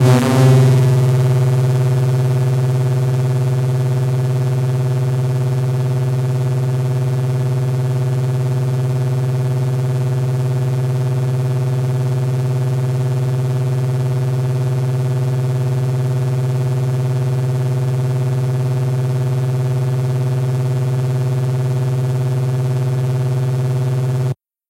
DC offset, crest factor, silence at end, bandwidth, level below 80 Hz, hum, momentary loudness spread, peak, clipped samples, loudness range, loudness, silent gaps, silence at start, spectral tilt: under 0.1%; 16 dB; 0.35 s; 13 kHz; -50 dBFS; none; 4 LU; 0 dBFS; under 0.1%; 2 LU; -17 LUFS; none; 0 s; -8 dB/octave